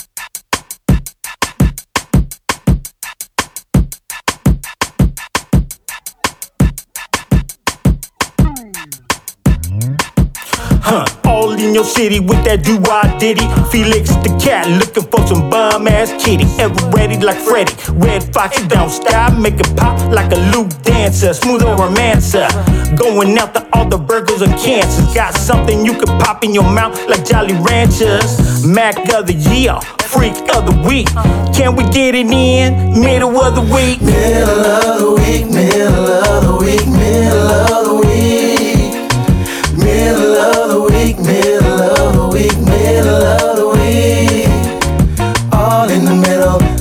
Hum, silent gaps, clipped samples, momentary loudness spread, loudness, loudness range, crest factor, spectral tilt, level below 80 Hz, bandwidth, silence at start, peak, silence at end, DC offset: none; none; under 0.1%; 7 LU; -12 LUFS; 7 LU; 10 dB; -5.5 dB/octave; -20 dBFS; 18.5 kHz; 0.15 s; 0 dBFS; 0 s; under 0.1%